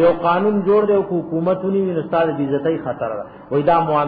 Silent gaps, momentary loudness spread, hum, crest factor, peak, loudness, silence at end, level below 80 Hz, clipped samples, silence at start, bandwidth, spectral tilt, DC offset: none; 8 LU; none; 12 dB; -4 dBFS; -18 LUFS; 0 s; -54 dBFS; under 0.1%; 0 s; 4.9 kHz; -11 dB/octave; under 0.1%